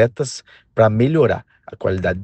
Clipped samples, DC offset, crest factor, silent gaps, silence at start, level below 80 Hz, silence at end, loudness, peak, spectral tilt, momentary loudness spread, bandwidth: under 0.1%; under 0.1%; 16 dB; none; 0 s; -48 dBFS; 0 s; -18 LUFS; -2 dBFS; -6.5 dB/octave; 12 LU; 9 kHz